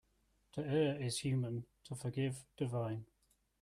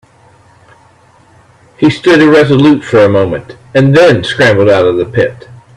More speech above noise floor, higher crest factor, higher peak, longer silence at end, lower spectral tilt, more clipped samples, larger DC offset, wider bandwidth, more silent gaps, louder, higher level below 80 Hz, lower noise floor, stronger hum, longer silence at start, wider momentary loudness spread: about the same, 38 dB vs 36 dB; first, 16 dB vs 10 dB; second, -24 dBFS vs 0 dBFS; first, 0.6 s vs 0.2 s; about the same, -6 dB/octave vs -6.5 dB/octave; second, under 0.1% vs 0.2%; neither; first, 14 kHz vs 11 kHz; neither; second, -40 LUFS vs -8 LUFS; second, -70 dBFS vs -44 dBFS; first, -76 dBFS vs -44 dBFS; neither; second, 0.55 s vs 1.8 s; first, 12 LU vs 8 LU